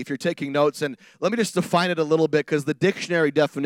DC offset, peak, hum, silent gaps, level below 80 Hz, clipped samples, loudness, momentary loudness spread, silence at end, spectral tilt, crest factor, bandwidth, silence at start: under 0.1%; -6 dBFS; none; none; -72 dBFS; under 0.1%; -23 LUFS; 6 LU; 0 s; -5.5 dB/octave; 16 dB; 16.5 kHz; 0 s